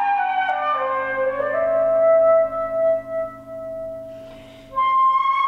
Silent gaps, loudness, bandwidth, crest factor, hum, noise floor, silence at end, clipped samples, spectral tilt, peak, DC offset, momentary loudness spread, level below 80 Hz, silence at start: none; -19 LUFS; 5.6 kHz; 12 dB; none; -40 dBFS; 0 s; under 0.1%; -5.5 dB/octave; -8 dBFS; under 0.1%; 17 LU; -54 dBFS; 0 s